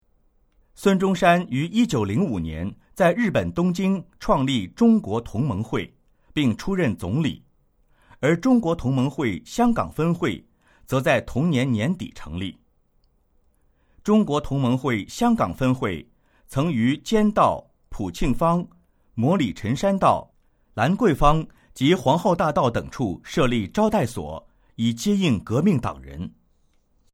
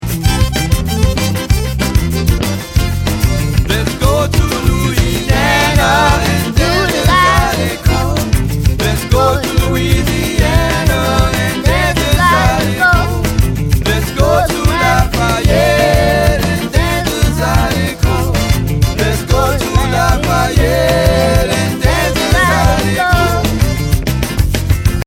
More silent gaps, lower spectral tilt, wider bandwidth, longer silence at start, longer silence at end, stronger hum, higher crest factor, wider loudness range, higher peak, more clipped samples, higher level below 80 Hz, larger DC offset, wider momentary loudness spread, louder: neither; first, -6.5 dB/octave vs -5 dB/octave; about the same, 16 kHz vs 17.5 kHz; first, 0.8 s vs 0 s; first, 0.85 s vs 0.05 s; neither; first, 20 dB vs 12 dB; about the same, 4 LU vs 2 LU; second, -4 dBFS vs 0 dBFS; neither; second, -40 dBFS vs -18 dBFS; neither; first, 13 LU vs 5 LU; second, -22 LUFS vs -12 LUFS